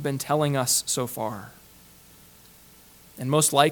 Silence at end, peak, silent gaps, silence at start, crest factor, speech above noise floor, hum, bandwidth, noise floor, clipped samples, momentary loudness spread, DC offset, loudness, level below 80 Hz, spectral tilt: 0 s; -2 dBFS; none; 0 s; 24 dB; 28 dB; 60 Hz at -60 dBFS; 19 kHz; -52 dBFS; under 0.1%; 15 LU; under 0.1%; -24 LUFS; -62 dBFS; -3.5 dB/octave